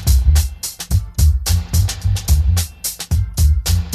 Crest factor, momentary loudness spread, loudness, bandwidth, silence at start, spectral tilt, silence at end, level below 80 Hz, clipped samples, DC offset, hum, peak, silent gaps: 12 dB; 7 LU; -17 LUFS; 14 kHz; 0 s; -4 dB/octave; 0 s; -18 dBFS; under 0.1%; under 0.1%; none; -4 dBFS; none